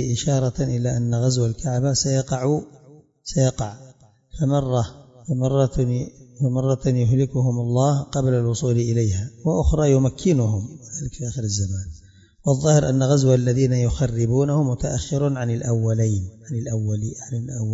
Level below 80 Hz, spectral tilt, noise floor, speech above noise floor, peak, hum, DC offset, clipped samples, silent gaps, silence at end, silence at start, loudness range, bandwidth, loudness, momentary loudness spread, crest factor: -38 dBFS; -6.5 dB/octave; -42 dBFS; 21 dB; -2 dBFS; none; under 0.1%; under 0.1%; none; 0 s; 0 s; 4 LU; 7.8 kHz; -22 LUFS; 11 LU; 18 dB